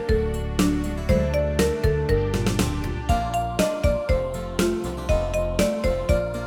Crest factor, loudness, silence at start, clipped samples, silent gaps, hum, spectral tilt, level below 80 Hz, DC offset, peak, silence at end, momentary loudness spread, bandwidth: 14 dB; -24 LUFS; 0 s; under 0.1%; none; none; -6 dB/octave; -28 dBFS; under 0.1%; -8 dBFS; 0 s; 3 LU; 19 kHz